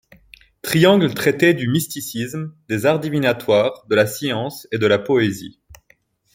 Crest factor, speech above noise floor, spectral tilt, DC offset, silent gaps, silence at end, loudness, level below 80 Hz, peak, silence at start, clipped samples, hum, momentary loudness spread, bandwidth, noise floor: 18 dB; 41 dB; -5.5 dB/octave; under 0.1%; none; 0.6 s; -18 LUFS; -56 dBFS; -2 dBFS; 0.65 s; under 0.1%; none; 11 LU; 17 kHz; -59 dBFS